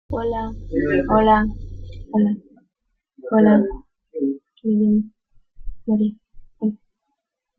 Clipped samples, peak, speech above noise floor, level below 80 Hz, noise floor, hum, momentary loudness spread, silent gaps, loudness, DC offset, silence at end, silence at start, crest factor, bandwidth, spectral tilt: under 0.1%; -2 dBFS; 59 dB; -38 dBFS; -77 dBFS; none; 21 LU; none; -20 LUFS; under 0.1%; 0.85 s; 0.1 s; 18 dB; 4.3 kHz; -10 dB/octave